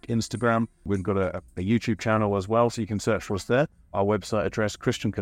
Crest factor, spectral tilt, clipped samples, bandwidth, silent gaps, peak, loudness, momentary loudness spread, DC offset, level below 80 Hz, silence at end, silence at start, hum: 16 dB; -6 dB/octave; under 0.1%; 15.5 kHz; none; -10 dBFS; -26 LUFS; 5 LU; under 0.1%; -52 dBFS; 0 s; 0.05 s; none